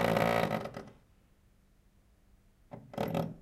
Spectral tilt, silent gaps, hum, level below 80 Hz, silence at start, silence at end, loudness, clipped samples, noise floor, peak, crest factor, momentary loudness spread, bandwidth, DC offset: -6 dB/octave; none; none; -60 dBFS; 0 s; 0 s; -33 LUFS; under 0.1%; -65 dBFS; -14 dBFS; 22 dB; 24 LU; 16.5 kHz; under 0.1%